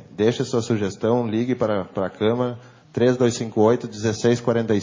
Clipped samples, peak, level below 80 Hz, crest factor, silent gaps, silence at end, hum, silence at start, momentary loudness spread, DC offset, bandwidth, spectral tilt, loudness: under 0.1%; -6 dBFS; -54 dBFS; 16 dB; none; 0 s; none; 0.1 s; 6 LU; under 0.1%; 7.6 kHz; -6 dB/octave; -22 LUFS